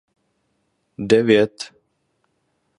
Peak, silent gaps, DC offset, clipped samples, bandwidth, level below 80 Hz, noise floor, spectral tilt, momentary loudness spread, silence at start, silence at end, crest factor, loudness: -2 dBFS; none; under 0.1%; under 0.1%; 11 kHz; -60 dBFS; -70 dBFS; -5.5 dB/octave; 20 LU; 1 s; 1.1 s; 20 dB; -17 LUFS